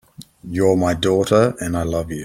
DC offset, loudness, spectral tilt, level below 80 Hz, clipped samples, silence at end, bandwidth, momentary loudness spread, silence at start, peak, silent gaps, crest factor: under 0.1%; -18 LUFS; -6 dB/octave; -44 dBFS; under 0.1%; 0 s; 16.5 kHz; 9 LU; 0.2 s; -2 dBFS; none; 16 dB